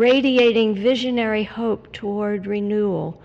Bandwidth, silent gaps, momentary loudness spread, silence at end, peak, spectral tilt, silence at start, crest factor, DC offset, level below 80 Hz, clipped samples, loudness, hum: 7.8 kHz; none; 9 LU; 0.05 s; -6 dBFS; -6.5 dB/octave; 0 s; 14 dB; under 0.1%; -54 dBFS; under 0.1%; -20 LUFS; none